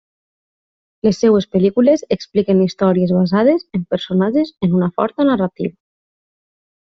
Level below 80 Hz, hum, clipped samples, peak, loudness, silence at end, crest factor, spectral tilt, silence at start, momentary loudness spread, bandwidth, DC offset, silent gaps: -54 dBFS; none; under 0.1%; -2 dBFS; -16 LUFS; 1.15 s; 14 dB; -7.5 dB/octave; 1.05 s; 6 LU; 7.2 kHz; under 0.1%; none